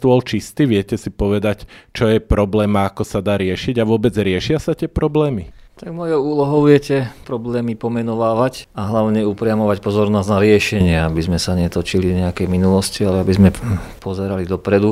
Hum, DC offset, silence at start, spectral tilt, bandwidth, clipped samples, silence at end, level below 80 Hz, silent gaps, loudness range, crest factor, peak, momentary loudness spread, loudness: none; under 0.1%; 0 s; -6.5 dB/octave; 15.5 kHz; under 0.1%; 0 s; -34 dBFS; none; 2 LU; 16 dB; 0 dBFS; 10 LU; -17 LUFS